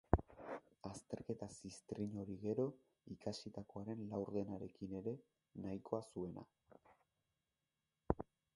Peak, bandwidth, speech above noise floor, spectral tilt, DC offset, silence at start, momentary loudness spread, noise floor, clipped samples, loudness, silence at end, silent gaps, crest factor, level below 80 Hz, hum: -12 dBFS; 11.5 kHz; over 44 dB; -7 dB/octave; under 0.1%; 0.1 s; 12 LU; under -90 dBFS; under 0.1%; -47 LUFS; 0.3 s; none; 34 dB; -58 dBFS; none